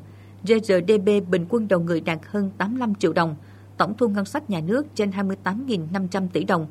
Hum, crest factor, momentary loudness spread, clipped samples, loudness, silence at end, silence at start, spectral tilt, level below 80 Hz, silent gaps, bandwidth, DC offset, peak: none; 20 dB; 7 LU; under 0.1%; -23 LUFS; 0 s; 0 s; -6.5 dB/octave; -66 dBFS; none; 13.5 kHz; under 0.1%; -4 dBFS